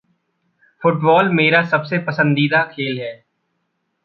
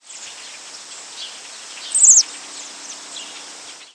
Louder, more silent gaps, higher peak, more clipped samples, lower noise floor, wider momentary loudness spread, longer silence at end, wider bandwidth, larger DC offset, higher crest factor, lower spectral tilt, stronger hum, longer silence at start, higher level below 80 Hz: second, -16 LUFS vs -11 LUFS; neither; about the same, 0 dBFS vs -2 dBFS; neither; first, -71 dBFS vs -38 dBFS; second, 10 LU vs 25 LU; first, 0.9 s vs 0.25 s; second, 6 kHz vs 11 kHz; neither; about the same, 18 dB vs 20 dB; first, -8.5 dB/octave vs 4 dB/octave; neither; first, 0.8 s vs 0.15 s; first, -64 dBFS vs -84 dBFS